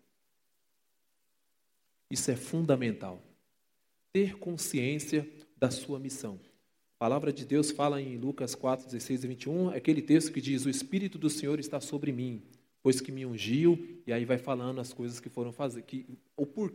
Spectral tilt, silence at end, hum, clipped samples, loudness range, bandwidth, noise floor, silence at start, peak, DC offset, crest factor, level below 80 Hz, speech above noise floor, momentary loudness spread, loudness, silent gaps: -5.5 dB/octave; 0 s; none; under 0.1%; 4 LU; 16.5 kHz; -80 dBFS; 2.1 s; -12 dBFS; under 0.1%; 20 dB; -76 dBFS; 49 dB; 12 LU; -32 LUFS; none